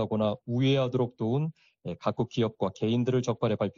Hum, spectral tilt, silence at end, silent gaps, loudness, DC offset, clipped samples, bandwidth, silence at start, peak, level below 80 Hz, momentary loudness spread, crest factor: none; -6.5 dB/octave; 0.05 s; none; -29 LUFS; under 0.1%; under 0.1%; 7.4 kHz; 0 s; -14 dBFS; -64 dBFS; 7 LU; 14 dB